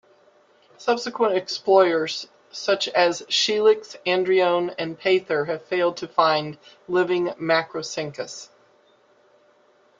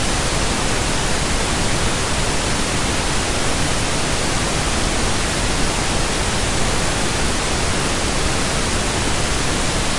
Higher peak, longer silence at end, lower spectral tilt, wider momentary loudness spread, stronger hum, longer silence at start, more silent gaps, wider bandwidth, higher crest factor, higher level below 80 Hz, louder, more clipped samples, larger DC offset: about the same, -4 dBFS vs -6 dBFS; first, 1.55 s vs 0 s; about the same, -3.5 dB/octave vs -3 dB/octave; first, 12 LU vs 0 LU; neither; first, 0.8 s vs 0 s; neither; second, 7.8 kHz vs 11.5 kHz; first, 20 dB vs 12 dB; second, -72 dBFS vs -26 dBFS; second, -22 LUFS vs -19 LUFS; neither; neither